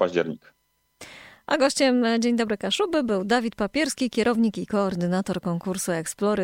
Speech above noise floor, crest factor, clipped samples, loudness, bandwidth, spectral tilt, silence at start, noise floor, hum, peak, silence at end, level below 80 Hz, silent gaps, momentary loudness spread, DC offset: 26 dB; 16 dB; under 0.1%; -24 LUFS; 16.5 kHz; -4.5 dB/octave; 0 s; -49 dBFS; none; -8 dBFS; 0 s; -58 dBFS; none; 9 LU; under 0.1%